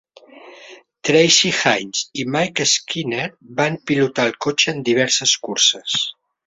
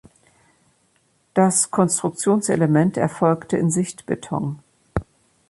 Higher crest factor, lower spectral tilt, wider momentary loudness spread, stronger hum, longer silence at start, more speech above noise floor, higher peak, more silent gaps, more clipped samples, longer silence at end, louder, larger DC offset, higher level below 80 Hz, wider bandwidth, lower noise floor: about the same, 18 dB vs 18 dB; second, -2.5 dB/octave vs -5.5 dB/octave; about the same, 11 LU vs 13 LU; neither; second, 0.35 s vs 1.35 s; second, 25 dB vs 44 dB; first, 0 dBFS vs -4 dBFS; neither; neither; about the same, 0.35 s vs 0.45 s; first, -17 LUFS vs -21 LUFS; neither; second, -62 dBFS vs -48 dBFS; second, 8 kHz vs 11.5 kHz; second, -43 dBFS vs -63 dBFS